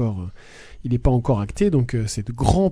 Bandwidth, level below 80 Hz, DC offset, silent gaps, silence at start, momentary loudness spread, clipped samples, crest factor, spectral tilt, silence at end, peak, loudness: 11 kHz; -32 dBFS; under 0.1%; none; 0 s; 12 LU; under 0.1%; 20 dB; -7 dB/octave; 0 s; 0 dBFS; -22 LUFS